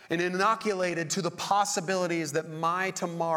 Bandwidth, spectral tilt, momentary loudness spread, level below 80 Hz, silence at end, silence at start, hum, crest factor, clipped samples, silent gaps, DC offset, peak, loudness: 18.5 kHz; -3.5 dB/octave; 5 LU; -74 dBFS; 0 s; 0 s; none; 18 dB; under 0.1%; none; under 0.1%; -10 dBFS; -28 LUFS